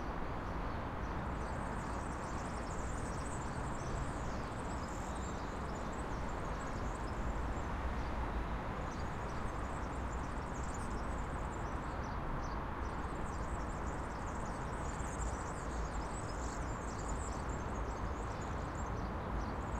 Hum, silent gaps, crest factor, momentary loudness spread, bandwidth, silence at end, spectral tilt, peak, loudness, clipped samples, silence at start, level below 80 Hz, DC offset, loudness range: none; none; 14 dB; 1 LU; 12 kHz; 0 s; -6 dB/octave; -26 dBFS; -42 LUFS; under 0.1%; 0 s; -44 dBFS; under 0.1%; 1 LU